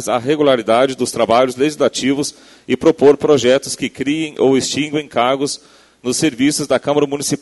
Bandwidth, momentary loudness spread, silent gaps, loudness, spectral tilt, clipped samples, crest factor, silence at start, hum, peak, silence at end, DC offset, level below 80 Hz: 12 kHz; 8 LU; none; -15 LUFS; -4 dB/octave; under 0.1%; 16 dB; 0 s; none; 0 dBFS; 0.05 s; under 0.1%; -54 dBFS